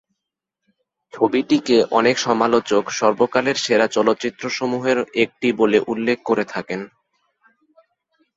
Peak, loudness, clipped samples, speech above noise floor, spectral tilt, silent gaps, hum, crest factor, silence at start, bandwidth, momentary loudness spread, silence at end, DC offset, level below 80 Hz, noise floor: -2 dBFS; -19 LUFS; under 0.1%; 64 dB; -4 dB/octave; none; none; 18 dB; 1.15 s; 8 kHz; 8 LU; 1.5 s; under 0.1%; -62 dBFS; -82 dBFS